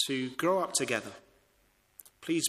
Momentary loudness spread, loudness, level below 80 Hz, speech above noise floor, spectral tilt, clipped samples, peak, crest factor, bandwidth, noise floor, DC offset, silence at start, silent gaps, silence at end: 14 LU; -31 LUFS; -74 dBFS; 38 dB; -3 dB/octave; under 0.1%; -14 dBFS; 20 dB; 15.5 kHz; -69 dBFS; under 0.1%; 0 s; none; 0 s